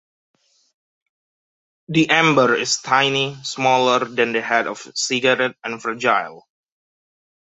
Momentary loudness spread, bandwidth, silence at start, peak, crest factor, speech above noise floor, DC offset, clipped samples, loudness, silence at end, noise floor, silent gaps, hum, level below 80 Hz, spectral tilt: 9 LU; 8.4 kHz; 1.9 s; -2 dBFS; 20 dB; over 71 dB; under 0.1%; under 0.1%; -18 LUFS; 1.15 s; under -90 dBFS; none; none; -66 dBFS; -3.5 dB/octave